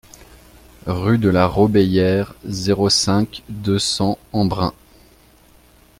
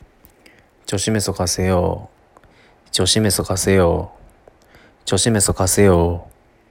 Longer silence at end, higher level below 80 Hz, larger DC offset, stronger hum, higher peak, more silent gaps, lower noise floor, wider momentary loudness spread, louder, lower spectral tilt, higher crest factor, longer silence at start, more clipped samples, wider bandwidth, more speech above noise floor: first, 1.3 s vs 0.45 s; about the same, -44 dBFS vs -42 dBFS; neither; neither; about the same, -2 dBFS vs -2 dBFS; neither; about the same, -50 dBFS vs -51 dBFS; second, 11 LU vs 14 LU; about the same, -18 LUFS vs -17 LUFS; about the same, -5 dB/octave vs -4 dB/octave; about the same, 18 dB vs 18 dB; about the same, 0.85 s vs 0.9 s; neither; about the same, 16 kHz vs 16.5 kHz; about the same, 33 dB vs 34 dB